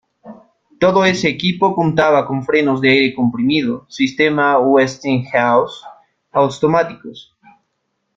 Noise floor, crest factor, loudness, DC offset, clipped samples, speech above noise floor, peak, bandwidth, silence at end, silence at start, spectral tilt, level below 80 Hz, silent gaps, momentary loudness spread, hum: -70 dBFS; 16 dB; -15 LUFS; under 0.1%; under 0.1%; 56 dB; -2 dBFS; 7.8 kHz; 0.95 s; 0.25 s; -6 dB/octave; -54 dBFS; none; 8 LU; none